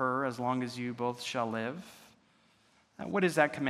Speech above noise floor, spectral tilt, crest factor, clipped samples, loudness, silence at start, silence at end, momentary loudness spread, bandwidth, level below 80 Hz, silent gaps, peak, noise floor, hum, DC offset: 35 dB; -5.5 dB/octave; 24 dB; under 0.1%; -33 LUFS; 0 s; 0 s; 15 LU; 14.5 kHz; -78 dBFS; none; -10 dBFS; -67 dBFS; none; under 0.1%